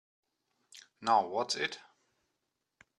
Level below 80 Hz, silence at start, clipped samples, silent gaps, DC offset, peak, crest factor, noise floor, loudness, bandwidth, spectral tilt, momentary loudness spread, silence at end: -86 dBFS; 0.75 s; under 0.1%; none; under 0.1%; -14 dBFS; 22 dB; -84 dBFS; -32 LUFS; 11.5 kHz; -2 dB/octave; 10 LU; 1.2 s